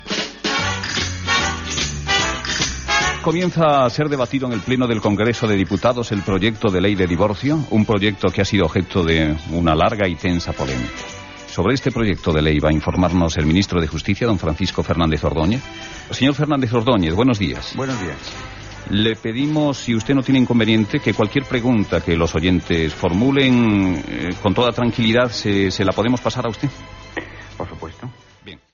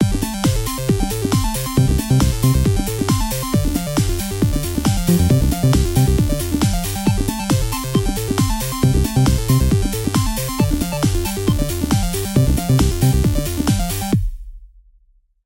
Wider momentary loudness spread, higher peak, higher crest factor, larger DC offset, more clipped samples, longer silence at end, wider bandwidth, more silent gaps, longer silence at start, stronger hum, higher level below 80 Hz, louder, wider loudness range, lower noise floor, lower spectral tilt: first, 10 LU vs 4 LU; about the same, -4 dBFS vs -2 dBFS; about the same, 14 dB vs 16 dB; neither; neither; second, 0.2 s vs 0.8 s; second, 7.4 kHz vs 17 kHz; neither; about the same, 0 s vs 0 s; neither; second, -36 dBFS vs -24 dBFS; about the same, -18 LUFS vs -18 LUFS; about the same, 3 LU vs 1 LU; second, -42 dBFS vs -55 dBFS; about the same, -4.5 dB/octave vs -5.5 dB/octave